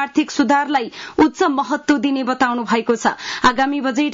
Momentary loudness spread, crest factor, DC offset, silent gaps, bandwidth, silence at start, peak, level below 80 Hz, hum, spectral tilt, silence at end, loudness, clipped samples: 4 LU; 14 dB; under 0.1%; none; 7.6 kHz; 0 s; -4 dBFS; -50 dBFS; none; -3.5 dB/octave; 0 s; -18 LUFS; under 0.1%